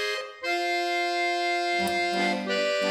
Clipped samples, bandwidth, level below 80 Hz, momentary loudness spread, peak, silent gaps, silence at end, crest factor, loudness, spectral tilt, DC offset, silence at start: under 0.1%; 15.5 kHz; -70 dBFS; 4 LU; -14 dBFS; none; 0 s; 12 dB; -26 LUFS; -3 dB/octave; under 0.1%; 0 s